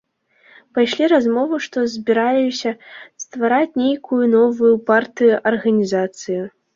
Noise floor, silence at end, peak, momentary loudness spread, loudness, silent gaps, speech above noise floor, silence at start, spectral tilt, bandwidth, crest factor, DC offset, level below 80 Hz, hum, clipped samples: -55 dBFS; 0.25 s; -2 dBFS; 11 LU; -17 LUFS; none; 38 dB; 0.75 s; -5 dB/octave; 7.6 kHz; 16 dB; under 0.1%; -64 dBFS; none; under 0.1%